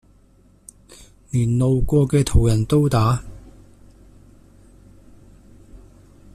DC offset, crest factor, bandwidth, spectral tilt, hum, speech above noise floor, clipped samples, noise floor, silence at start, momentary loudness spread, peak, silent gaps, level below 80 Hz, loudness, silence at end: under 0.1%; 18 dB; 14 kHz; -7.5 dB/octave; none; 37 dB; under 0.1%; -53 dBFS; 1.35 s; 8 LU; -4 dBFS; none; -32 dBFS; -19 LUFS; 0.6 s